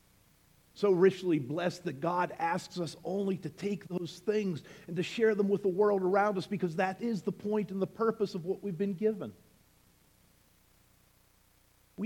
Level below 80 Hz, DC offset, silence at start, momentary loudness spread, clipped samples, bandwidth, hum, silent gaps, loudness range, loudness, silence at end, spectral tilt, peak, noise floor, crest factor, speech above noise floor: -72 dBFS; under 0.1%; 0.75 s; 10 LU; under 0.1%; 16 kHz; none; none; 7 LU; -32 LUFS; 0 s; -6.5 dB/octave; -12 dBFS; -66 dBFS; 20 dB; 35 dB